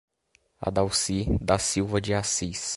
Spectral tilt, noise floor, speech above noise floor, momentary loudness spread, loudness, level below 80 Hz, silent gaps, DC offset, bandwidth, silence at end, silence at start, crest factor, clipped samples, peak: -4 dB/octave; -67 dBFS; 41 dB; 3 LU; -26 LUFS; -40 dBFS; none; under 0.1%; 11.5 kHz; 0 s; 0.6 s; 22 dB; under 0.1%; -6 dBFS